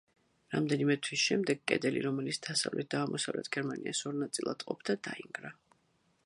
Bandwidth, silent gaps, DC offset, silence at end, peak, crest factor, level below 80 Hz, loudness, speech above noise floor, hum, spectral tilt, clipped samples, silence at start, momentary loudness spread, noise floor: 11.5 kHz; none; under 0.1%; 0.75 s; -12 dBFS; 24 dB; -78 dBFS; -33 LUFS; 39 dB; none; -4 dB/octave; under 0.1%; 0.5 s; 8 LU; -73 dBFS